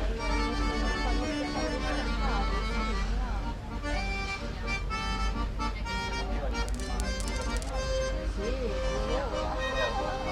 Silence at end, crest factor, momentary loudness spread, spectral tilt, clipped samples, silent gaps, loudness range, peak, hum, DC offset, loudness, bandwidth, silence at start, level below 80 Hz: 0 s; 18 dB; 3 LU; -5 dB/octave; under 0.1%; none; 2 LU; -12 dBFS; none; under 0.1%; -32 LUFS; 11.5 kHz; 0 s; -32 dBFS